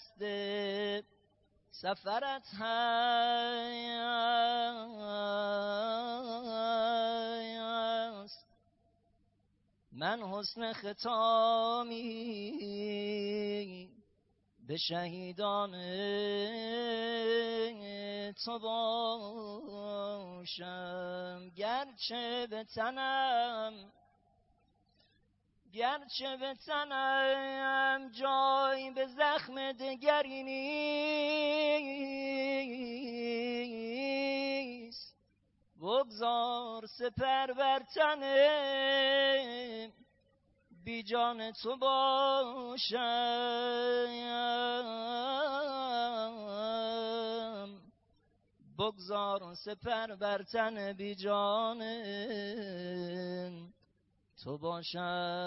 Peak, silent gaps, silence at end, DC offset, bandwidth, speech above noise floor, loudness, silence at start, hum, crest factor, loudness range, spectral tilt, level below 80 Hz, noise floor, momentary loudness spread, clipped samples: -16 dBFS; none; 0 s; under 0.1%; 5.8 kHz; 40 dB; -35 LUFS; 0 s; 50 Hz at -75 dBFS; 20 dB; 7 LU; -1 dB/octave; -74 dBFS; -75 dBFS; 12 LU; under 0.1%